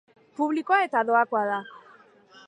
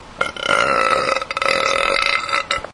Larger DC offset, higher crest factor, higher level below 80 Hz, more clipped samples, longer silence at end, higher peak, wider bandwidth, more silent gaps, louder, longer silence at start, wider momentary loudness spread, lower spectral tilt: neither; about the same, 18 dB vs 18 dB; second, -84 dBFS vs -46 dBFS; neither; first, 0.7 s vs 0 s; second, -8 dBFS vs 0 dBFS; second, 10 kHz vs 11.5 kHz; neither; second, -24 LUFS vs -17 LUFS; first, 0.4 s vs 0 s; first, 15 LU vs 4 LU; first, -5.5 dB/octave vs -1.5 dB/octave